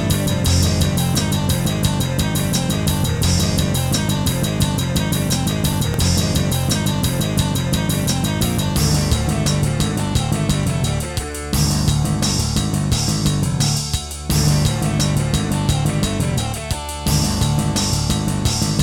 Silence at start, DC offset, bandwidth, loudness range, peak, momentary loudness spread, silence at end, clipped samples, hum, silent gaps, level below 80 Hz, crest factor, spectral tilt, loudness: 0 s; under 0.1%; 18 kHz; 1 LU; -4 dBFS; 3 LU; 0 s; under 0.1%; none; none; -30 dBFS; 14 dB; -4.5 dB/octave; -18 LUFS